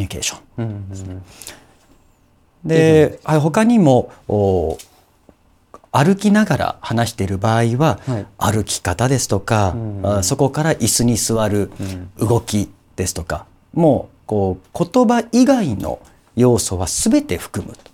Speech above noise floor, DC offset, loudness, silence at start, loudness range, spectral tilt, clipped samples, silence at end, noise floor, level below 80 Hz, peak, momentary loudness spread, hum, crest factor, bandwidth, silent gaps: 38 dB; under 0.1%; -17 LUFS; 0 s; 3 LU; -5.5 dB/octave; under 0.1%; 0.2 s; -55 dBFS; -42 dBFS; 0 dBFS; 14 LU; none; 16 dB; 18 kHz; none